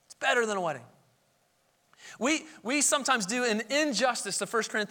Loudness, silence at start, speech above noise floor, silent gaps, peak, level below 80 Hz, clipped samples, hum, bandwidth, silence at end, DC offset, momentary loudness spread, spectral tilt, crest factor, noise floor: -28 LUFS; 0.1 s; 41 dB; none; -10 dBFS; -78 dBFS; under 0.1%; none; 19 kHz; 0.05 s; under 0.1%; 7 LU; -2 dB/octave; 20 dB; -70 dBFS